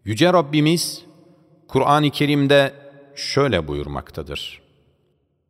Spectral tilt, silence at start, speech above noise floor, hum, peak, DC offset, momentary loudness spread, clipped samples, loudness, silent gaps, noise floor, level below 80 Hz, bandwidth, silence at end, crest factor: -5.5 dB/octave; 0.05 s; 47 dB; none; -4 dBFS; under 0.1%; 15 LU; under 0.1%; -19 LUFS; none; -66 dBFS; -46 dBFS; 16 kHz; 0.95 s; 18 dB